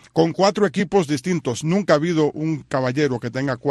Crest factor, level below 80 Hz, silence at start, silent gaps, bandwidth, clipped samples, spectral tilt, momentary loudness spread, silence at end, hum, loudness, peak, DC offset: 18 dB; -56 dBFS; 0.15 s; none; 12.5 kHz; under 0.1%; -6 dB/octave; 6 LU; 0 s; none; -20 LUFS; -2 dBFS; under 0.1%